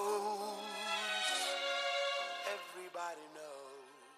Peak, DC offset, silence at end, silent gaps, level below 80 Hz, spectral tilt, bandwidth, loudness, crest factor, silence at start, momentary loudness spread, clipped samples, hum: -26 dBFS; under 0.1%; 0 s; none; under -90 dBFS; 0 dB/octave; 15 kHz; -38 LUFS; 14 dB; 0 s; 16 LU; under 0.1%; none